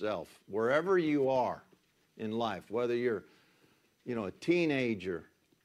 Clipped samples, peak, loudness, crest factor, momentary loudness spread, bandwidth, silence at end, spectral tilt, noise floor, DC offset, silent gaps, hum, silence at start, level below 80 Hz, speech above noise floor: under 0.1%; -16 dBFS; -33 LUFS; 18 dB; 12 LU; 12 kHz; 0.4 s; -6.5 dB/octave; -69 dBFS; under 0.1%; none; none; 0 s; -74 dBFS; 37 dB